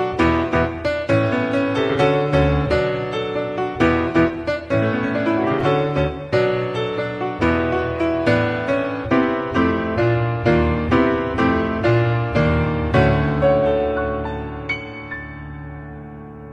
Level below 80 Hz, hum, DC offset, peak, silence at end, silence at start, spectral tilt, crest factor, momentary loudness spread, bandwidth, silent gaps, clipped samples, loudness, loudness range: -34 dBFS; none; under 0.1%; -2 dBFS; 0 s; 0 s; -8 dB/octave; 16 dB; 9 LU; 9.4 kHz; none; under 0.1%; -19 LUFS; 2 LU